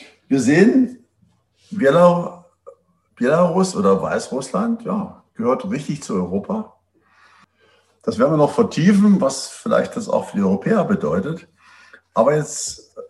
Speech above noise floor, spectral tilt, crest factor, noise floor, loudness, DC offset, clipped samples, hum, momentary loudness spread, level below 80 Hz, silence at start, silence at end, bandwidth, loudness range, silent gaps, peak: 43 dB; -6 dB/octave; 18 dB; -61 dBFS; -18 LUFS; under 0.1%; under 0.1%; none; 13 LU; -60 dBFS; 0 s; 0.05 s; 12 kHz; 6 LU; none; -2 dBFS